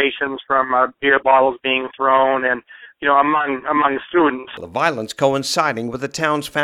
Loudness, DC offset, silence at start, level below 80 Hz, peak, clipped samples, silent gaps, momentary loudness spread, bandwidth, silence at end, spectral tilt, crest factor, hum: -18 LUFS; under 0.1%; 0 s; -58 dBFS; 0 dBFS; under 0.1%; none; 8 LU; 15.5 kHz; 0 s; -4 dB/octave; 18 dB; none